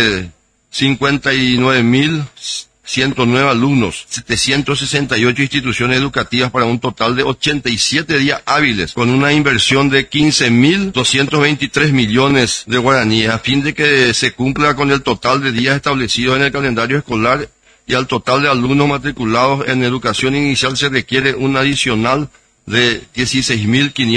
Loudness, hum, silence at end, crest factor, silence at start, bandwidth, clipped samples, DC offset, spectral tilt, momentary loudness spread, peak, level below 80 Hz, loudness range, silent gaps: -13 LUFS; none; 0 s; 14 dB; 0 s; 10.5 kHz; under 0.1%; under 0.1%; -4.5 dB/octave; 5 LU; 0 dBFS; -40 dBFS; 3 LU; none